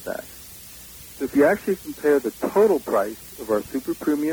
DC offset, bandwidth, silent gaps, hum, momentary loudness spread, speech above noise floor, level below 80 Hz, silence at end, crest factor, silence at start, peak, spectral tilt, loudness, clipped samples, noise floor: under 0.1%; over 20 kHz; none; none; 20 LU; 20 dB; -54 dBFS; 0 s; 16 dB; 0 s; -8 dBFS; -5 dB/octave; -22 LUFS; under 0.1%; -42 dBFS